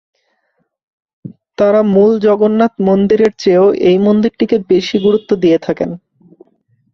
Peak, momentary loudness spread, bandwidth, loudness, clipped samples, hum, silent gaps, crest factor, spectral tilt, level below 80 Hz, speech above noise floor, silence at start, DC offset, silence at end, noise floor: 0 dBFS; 7 LU; 6.8 kHz; -12 LUFS; under 0.1%; none; none; 12 dB; -7.5 dB/octave; -52 dBFS; 54 dB; 1.25 s; under 0.1%; 0.95 s; -65 dBFS